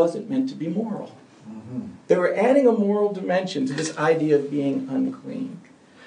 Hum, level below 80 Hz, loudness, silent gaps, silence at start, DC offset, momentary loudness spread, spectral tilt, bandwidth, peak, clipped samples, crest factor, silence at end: none; -74 dBFS; -23 LUFS; none; 0 s; under 0.1%; 16 LU; -6 dB/octave; 10 kHz; -4 dBFS; under 0.1%; 18 dB; 0 s